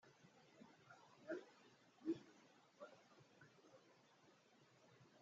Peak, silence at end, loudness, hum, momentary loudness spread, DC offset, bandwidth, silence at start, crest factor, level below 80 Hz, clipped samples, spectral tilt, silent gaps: -34 dBFS; 0 s; -54 LUFS; none; 19 LU; under 0.1%; 7.4 kHz; 0.05 s; 24 dB; under -90 dBFS; under 0.1%; -5 dB/octave; none